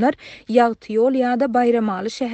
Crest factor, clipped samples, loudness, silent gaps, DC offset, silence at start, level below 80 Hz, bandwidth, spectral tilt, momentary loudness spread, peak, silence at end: 16 dB; under 0.1%; -19 LUFS; none; under 0.1%; 0 s; -60 dBFS; 8.6 kHz; -6 dB/octave; 6 LU; -2 dBFS; 0 s